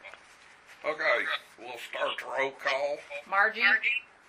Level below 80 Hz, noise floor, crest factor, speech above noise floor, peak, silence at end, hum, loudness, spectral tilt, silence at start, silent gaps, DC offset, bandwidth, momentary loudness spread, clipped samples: -78 dBFS; -55 dBFS; 20 dB; 26 dB; -10 dBFS; 0.25 s; none; -28 LUFS; -1.5 dB/octave; 0.05 s; none; under 0.1%; 15.5 kHz; 15 LU; under 0.1%